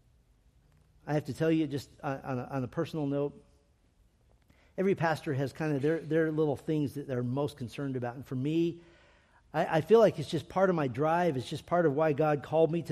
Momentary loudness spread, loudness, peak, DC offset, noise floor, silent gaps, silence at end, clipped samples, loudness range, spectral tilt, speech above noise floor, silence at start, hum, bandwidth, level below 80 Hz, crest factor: 10 LU; -31 LUFS; -12 dBFS; under 0.1%; -66 dBFS; none; 0 s; under 0.1%; 7 LU; -7.5 dB/octave; 37 dB; 1.05 s; none; 14 kHz; -64 dBFS; 20 dB